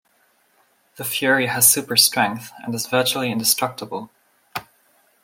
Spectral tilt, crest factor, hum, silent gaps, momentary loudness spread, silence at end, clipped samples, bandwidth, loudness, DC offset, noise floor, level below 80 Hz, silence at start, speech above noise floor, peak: -1.5 dB/octave; 22 dB; none; none; 19 LU; 0.6 s; under 0.1%; 16.5 kHz; -18 LUFS; under 0.1%; -62 dBFS; -68 dBFS; 1 s; 42 dB; 0 dBFS